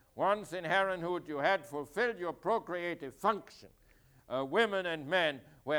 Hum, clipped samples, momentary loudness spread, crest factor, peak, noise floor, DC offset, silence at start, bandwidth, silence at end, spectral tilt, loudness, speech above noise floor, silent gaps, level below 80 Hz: none; under 0.1%; 8 LU; 18 dB; -16 dBFS; -64 dBFS; under 0.1%; 0.15 s; over 20 kHz; 0 s; -4.5 dB/octave; -34 LUFS; 30 dB; none; -70 dBFS